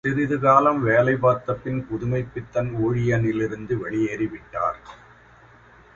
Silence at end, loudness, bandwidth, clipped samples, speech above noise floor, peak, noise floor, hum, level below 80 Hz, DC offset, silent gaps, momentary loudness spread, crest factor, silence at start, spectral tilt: 1 s; -22 LUFS; 7.4 kHz; under 0.1%; 29 dB; -2 dBFS; -51 dBFS; none; -50 dBFS; under 0.1%; none; 11 LU; 20 dB; 0.05 s; -8.5 dB/octave